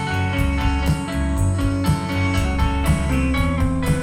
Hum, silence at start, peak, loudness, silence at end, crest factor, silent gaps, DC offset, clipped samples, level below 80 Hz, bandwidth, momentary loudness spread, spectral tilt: none; 0 s; -6 dBFS; -21 LUFS; 0 s; 14 dB; none; under 0.1%; under 0.1%; -24 dBFS; 15.5 kHz; 2 LU; -6 dB/octave